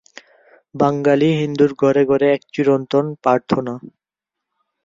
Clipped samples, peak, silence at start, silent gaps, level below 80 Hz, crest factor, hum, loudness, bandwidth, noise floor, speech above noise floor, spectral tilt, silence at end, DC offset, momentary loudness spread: under 0.1%; -2 dBFS; 0.75 s; none; -58 dBFS; 16 dB; none; -17 LUFS; 7.6 kHz; -84 dBFS; 68 dB; -7.5 dB/octave; 1 s; under 0.1%; 6 LU